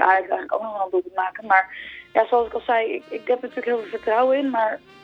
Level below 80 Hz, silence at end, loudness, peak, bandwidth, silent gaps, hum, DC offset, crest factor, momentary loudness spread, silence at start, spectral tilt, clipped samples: -62 dBFS; 0.25 s; -22 LUFS; -2 dBFS; 6 kHz; none; none; under 0.1%; 20 dB; 8 LU; 0 s; -5.5 dB/octave; under 0.1%